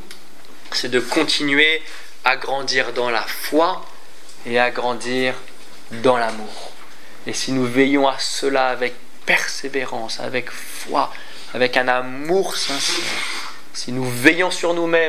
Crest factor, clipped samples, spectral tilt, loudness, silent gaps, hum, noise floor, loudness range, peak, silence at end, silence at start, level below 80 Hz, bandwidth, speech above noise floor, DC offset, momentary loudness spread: 22 dB; under 0.1%; -3 dB/octave; -19 LUFS; none; none; -45 dBFS; 3 LU; 0 dBFS; 0 s; 0 s; -66 dBFS; 16 kHz; 25 dB; 5%; 15 LU